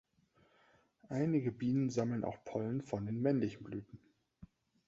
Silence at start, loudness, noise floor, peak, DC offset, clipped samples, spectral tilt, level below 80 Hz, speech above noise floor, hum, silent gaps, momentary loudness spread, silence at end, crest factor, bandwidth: 1.1 s; -37 LUFS; -72 dBFS; -20 dBFS; under 0.1%; under 0.1%; -8.5 dB/octave; -70 dBFS; 36 dB; none; none; 13 LU; 0.45 s; 18 dB; 7.6 kHz